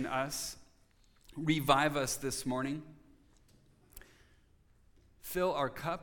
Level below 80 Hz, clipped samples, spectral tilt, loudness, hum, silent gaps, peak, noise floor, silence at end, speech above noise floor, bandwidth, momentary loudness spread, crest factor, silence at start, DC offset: -60 dBFS; under 0.1%; -4 dB/octave; -34 LUFS; none; none; -12 dBFS; -66 dBFS; 0 s; 32 dB; 19 kHz; 23 LU; 24 dB; 0 s; under 0.1%